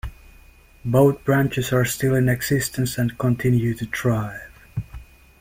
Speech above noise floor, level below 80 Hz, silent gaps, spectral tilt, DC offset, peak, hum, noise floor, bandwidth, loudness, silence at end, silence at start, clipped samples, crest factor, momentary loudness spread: 29 dB; -44 dBFS; none; -6 dB/octave; under 0.1%; -4 dBFS; none; -49 dBFS; 16.5 kHz; -21 LUFS; 0.35 s; 0.05 s; under 0.1%; 18 dB; 16 LU